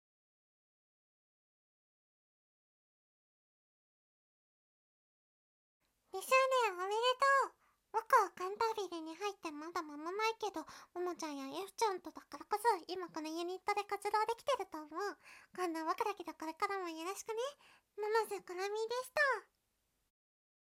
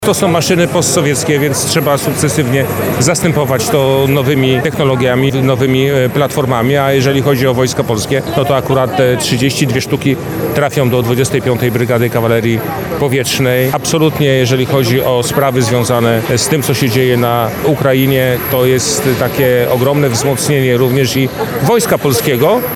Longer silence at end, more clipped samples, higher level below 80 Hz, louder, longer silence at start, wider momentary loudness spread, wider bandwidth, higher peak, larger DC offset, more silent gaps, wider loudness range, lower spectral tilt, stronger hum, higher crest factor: first, 1.3 s vs 0 s; neither; second, -84 dBFS vs -40 dBFS; second, -38 LUFS vs -12 LUFS; first, 6.15 s vs 0 s; first, 13 LU vs 3 LU; second, 16.5 kHz vs 19 kHz; second, -18 dBFS vs 0 dBFS; second, under 0.1% vs 0.2%; neither; first, 7 LU vs 1 LU; second, -1.5 dB/octave vs -5 dB/octave; neither; first, 22 dB vs 12 dB